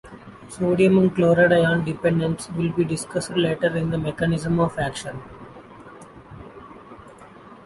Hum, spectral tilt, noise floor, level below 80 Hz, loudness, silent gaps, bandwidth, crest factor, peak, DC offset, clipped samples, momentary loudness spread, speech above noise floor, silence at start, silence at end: none; -6.5 dB/octave; -45 dBFS; -50 dBFS; -21 LUFS; none; 11.5 kHz; 18 dB; -4 dBFS; under 0.1%; under 0.1%; 26 LU; 24 dB; 0.05 s; 0.1 s